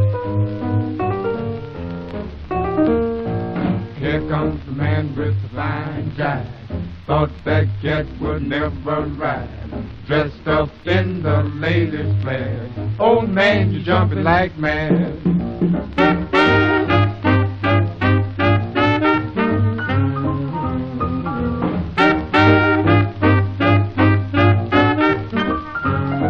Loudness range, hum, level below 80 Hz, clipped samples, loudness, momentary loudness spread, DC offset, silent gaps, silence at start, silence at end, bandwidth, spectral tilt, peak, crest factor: 6 LU; none; -36 dBFS; under 0.1%; -18 LUFS; 9 LU; under 0.1%; none; 0 s; 0 s; 6.2 kHz; -8.5 dB/octave; 0 dBFS; 18 dB